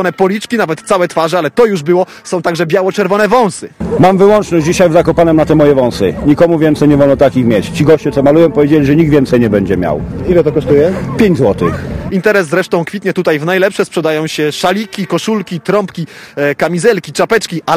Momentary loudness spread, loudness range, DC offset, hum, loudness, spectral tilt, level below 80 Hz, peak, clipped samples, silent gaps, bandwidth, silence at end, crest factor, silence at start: 8 LU; 5 LU; under 0.1%; none; -11 LUFS; -6 dB/octave; -34 dBFS; 0 dBFS; 0.7%; none; 15.5 kHz; 0 s; 10 dB; 0 s